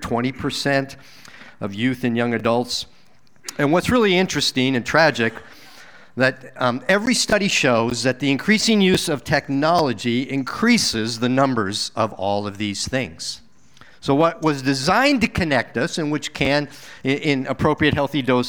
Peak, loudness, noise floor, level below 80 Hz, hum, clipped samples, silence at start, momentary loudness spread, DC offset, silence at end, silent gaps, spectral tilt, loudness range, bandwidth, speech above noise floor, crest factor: -2 dBFS; -20 LUFS; -56 dBFS; -48 dBFS; none; under 0.1%; 0 s; 9 LU; 0.5%; 0 s; none; -4.5 dB/octave; 5 LU; over 20 kHz; 36 dB; 18 dB